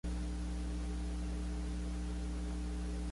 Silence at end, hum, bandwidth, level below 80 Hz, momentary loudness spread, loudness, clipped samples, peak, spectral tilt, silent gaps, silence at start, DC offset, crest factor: 0 s; 60 Hz at -40 dBFS; 11.5 kHz; -40 dBFS; 0 LU; -41 LUFS; under 0.1%; -30 dBFS; -6.5 dB/octave; none; 0.05 s; under 0.1%; 8 dB